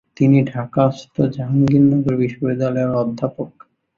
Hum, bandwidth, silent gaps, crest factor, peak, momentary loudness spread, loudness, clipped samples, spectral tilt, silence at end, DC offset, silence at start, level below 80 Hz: none; 7 kHz; none; 16 dB; -2 dBFS; 10 LU; -18 LUFS; under 0.1%; -9.5 dB/octave; 0.5 s; under 0.1%; 0.2 s; -52 dBFS